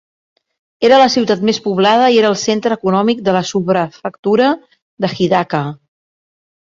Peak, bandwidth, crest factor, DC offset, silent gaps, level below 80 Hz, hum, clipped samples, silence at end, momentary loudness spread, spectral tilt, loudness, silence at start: -2 dBFS; 7.8 kHz; 14 dB; under 0.1%; 4.19-4.23 s, 4.82-4.97 s; -56 dBFS; none; under 0.1%; 0.9 s; 11 LU; -5 dB/octave; -14 LUFS; 0.8 s